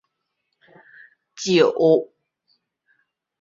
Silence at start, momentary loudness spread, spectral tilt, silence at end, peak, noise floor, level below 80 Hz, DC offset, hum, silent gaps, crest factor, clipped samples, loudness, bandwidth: 1.4 s; 15 LU; -5 dB/octave; 1.4 s; -4 dBFS; -76 dBFS; -70 dBFS; under 0.1%; none; none; 20 dB; under 0.1%; -19 LUFS; 7.8 kHz